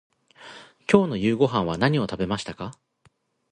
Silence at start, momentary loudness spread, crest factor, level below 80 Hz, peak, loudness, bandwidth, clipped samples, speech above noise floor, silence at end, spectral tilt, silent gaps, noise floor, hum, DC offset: 0.4 s; 21 LU; 24 dB; -54 dBFS; -2 dBFS; -23 LUFS; 10 kHz; under 0.1%; 41 dB; 0.8 s; -6.5 dB/octave; none; -64 dBFS; none; under 0.1%